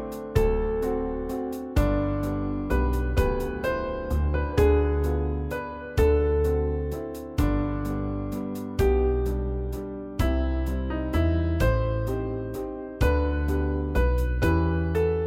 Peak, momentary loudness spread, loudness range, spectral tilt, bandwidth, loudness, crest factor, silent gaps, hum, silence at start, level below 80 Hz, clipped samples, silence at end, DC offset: -8 dBFS; 9 LU; 2 LU; -8 dB/octave; 16 kHz; -26 LUFS; 18 dB; none; none; 0 s; -28 dBFS; under 0.1%; 0 s; under 0.1%